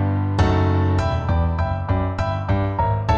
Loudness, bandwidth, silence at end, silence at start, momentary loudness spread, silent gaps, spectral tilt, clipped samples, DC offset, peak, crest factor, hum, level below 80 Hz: -21 LUFS; 7.4 kHz; 0 s; 0 s; 4 LU; none; -8 dB/octave; under 0.1%; under 0.1%; -6 dBFS; 14 dB; none; -30 dBFS